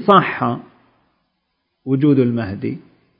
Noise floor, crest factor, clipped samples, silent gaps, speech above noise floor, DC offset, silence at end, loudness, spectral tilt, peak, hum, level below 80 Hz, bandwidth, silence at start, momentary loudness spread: -71 dBFS; 18 dB; under 0.1%; none; 55 dB; under 0.1%; 0.4 s; -18 LUFS; -10 dB/octave; 0 dBFS; none; -52 dBFS; 5.4 kHz; 0 s; 17 LU